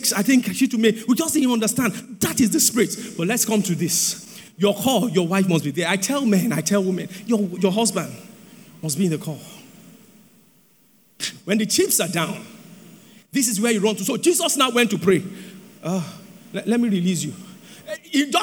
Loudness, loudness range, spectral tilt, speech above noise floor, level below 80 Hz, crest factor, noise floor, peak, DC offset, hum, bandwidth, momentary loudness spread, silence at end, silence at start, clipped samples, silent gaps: -20 LUFS; 6 LU; -4 dB/octave; 36 dB; -66 dBFS; 18 dB; -57 dBFS; -4 dBFS; under 0.1%; none; over 20 kHz; 16 LU; 0 s; 0 s; under 0.1%; none